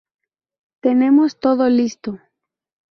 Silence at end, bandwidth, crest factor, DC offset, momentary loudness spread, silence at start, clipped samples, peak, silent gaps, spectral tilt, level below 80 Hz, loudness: 0.75 s; 6.4 kHz; 14 dB; under 0.1%; 17 LU; 0.85 s; under 0.1%; -4 dBFS; none; -6 dB/octave; -62 dBFS; -16 LUFS